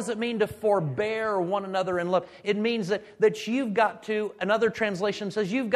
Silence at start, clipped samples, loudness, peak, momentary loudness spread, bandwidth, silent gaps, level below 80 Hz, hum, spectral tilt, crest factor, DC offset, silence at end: 0 s; under 0.1%; -27 LUFS; -8 dBFS; 5 LU; 13.5 kHz; none; -66 dBFS; none; -5.5 dB/octave; 18 dB; under 0.1%; 0 s